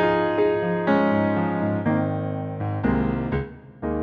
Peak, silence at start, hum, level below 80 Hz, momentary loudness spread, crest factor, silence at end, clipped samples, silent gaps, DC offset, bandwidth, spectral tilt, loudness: -8 dBFS; 0 s; none; -42 dBFS; 9 LU; 14 dB; 0 s; under 0.1%; none; under 0.1%; 5.6 kHz; -10 dB/octave; -23 LUFS